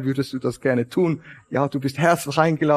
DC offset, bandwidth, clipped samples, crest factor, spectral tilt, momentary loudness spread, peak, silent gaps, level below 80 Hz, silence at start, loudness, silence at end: under 0.1%; 15 kHz; under 0.1%; 20 dB; -6.5 dB/octave; 6 LU; -2 dBFS; none; -60 dBFS; 0 s; -22 LUFS; 0 s